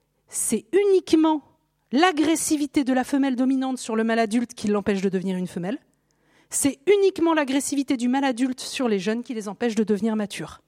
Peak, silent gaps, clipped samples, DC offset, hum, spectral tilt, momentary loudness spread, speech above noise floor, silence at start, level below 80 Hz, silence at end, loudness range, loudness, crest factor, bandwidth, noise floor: -2 dBFS; none; under 0.1%; under 0.1%; none; -4 dB/octave; 9 LU; 42 dB; 0.3 s; -62 dBFS; 0.1 s; 3 LU; -23 LUFS; 20 dB; 16 kHz; -64 dBFS